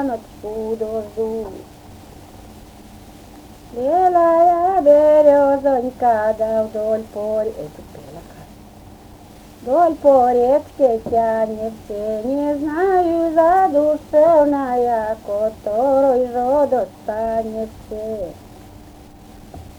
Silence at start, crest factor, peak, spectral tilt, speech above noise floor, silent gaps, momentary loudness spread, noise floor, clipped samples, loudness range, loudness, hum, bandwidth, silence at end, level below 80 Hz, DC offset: 0 s; 16 dB; -2 dBFS; -7 dB/octave; 25 dB; none; 16 LU; -41 dBFS; under 0.1%; 10 LU; -17 LUFS; none; 19.5 kHz; 0.05 s; -46 dBFS; under 0.1%